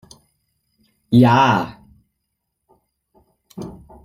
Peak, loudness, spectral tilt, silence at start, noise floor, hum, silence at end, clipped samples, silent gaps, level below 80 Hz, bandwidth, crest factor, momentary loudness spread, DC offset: -2 dBFS; -15 LUFS; -7 dB/octave; 1.1 s; -76 dBFS; none; 0.35 s; under 0.1%; none; -54 dBFS; 15.5 kHz; 20 dB; 23 LU; under 0.1%